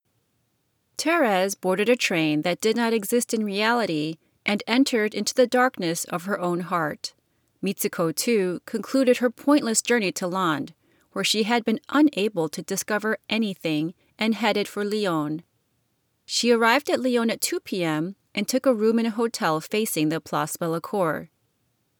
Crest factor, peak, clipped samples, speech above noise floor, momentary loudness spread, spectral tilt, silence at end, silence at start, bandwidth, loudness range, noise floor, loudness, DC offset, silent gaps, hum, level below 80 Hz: 18 dB; -6 dBFS; under 0.1%; 48 dB; 8 LU; -4 dB/octave; 0.75 s; 1 s; over 20 kHz; 3 LU; -71 dBFS; -24 LUFS; under 0.1%; none; none; -76 dBFS